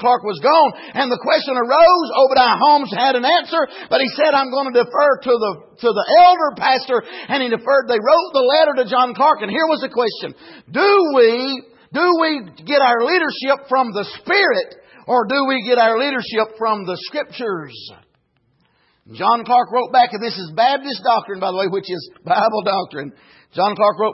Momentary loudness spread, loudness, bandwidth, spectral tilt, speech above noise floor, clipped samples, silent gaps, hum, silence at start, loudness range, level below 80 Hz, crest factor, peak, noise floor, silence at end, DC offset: 12 LU; -16 LUFS; 5.8 kHz; -7.5 dB/octave; 47 dB; under 0.1%; none; none; 0 s; 6 LU; -62 dBFS; 14 dB; -2 dBFS; -63 dBFS; 0 s; under 0.1%